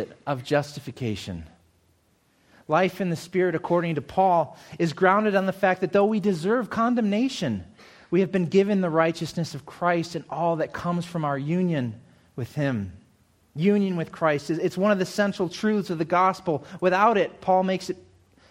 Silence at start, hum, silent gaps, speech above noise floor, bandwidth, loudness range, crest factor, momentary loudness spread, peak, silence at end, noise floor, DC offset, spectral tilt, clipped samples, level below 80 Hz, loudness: 0 s; none; none; 41 dB; 16 kHz; 5 LU; 20 dB; 11 LU; -4 dBFS; 0.5 s; -65 dBFS; under 0.1%; -6.5 dB/octave; under 0.1%; -60 dBFS; -24 LUFS